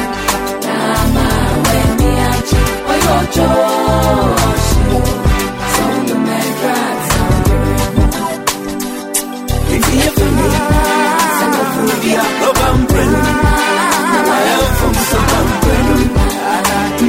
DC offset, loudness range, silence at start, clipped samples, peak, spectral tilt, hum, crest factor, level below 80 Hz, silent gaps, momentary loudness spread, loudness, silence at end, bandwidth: under 0.1%; 3 LU; 0 s; under 0.1%; 0 dBFS; -4.5 dB/octave; none; 12 dB; -20 dBFS; none; 4 LU; -13 LUFS; 0 s; 16.5 kHz